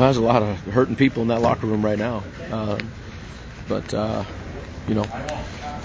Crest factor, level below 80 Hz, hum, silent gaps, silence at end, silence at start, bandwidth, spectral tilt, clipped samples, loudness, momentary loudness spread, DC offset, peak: 22 dB; -40 dBFS; none; none; 0 s; 0 s; 8 kHz; -7 dB/octave; under 0.1%; -23 LUFS; 16 LU; under 0.1%; -2 dBFS